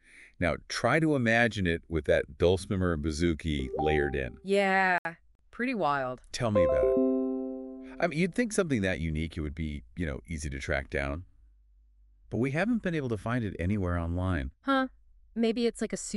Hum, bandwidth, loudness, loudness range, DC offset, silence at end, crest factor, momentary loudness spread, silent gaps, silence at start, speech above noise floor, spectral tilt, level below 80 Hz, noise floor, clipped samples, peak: none; 12 kHz; -29 LUFS; 6 LU; under 0.1%; 0 s; 18 dB; 11 LU; 4.98-5.05 s, 5.35-5.39 s; 0.15 s; 32 dB; -6 dB/octave; -44 dBFS; -61 dBFS; under 0.1%; -12 dBFS